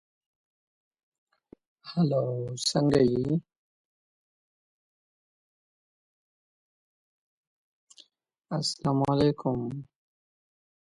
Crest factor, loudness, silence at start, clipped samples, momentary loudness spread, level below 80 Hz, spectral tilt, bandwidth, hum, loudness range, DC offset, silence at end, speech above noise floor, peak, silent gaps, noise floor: 22 dB; -27 LUFS; 1.85 s; under 0.1%; 12 LU; -60 dBFS; -6 dB/octave; 11.5 kHz; none; 9 LU; under 0.1%; 1 s; 33 dB; -10 dBFS; 3.58-7.87 s; -59 dBFS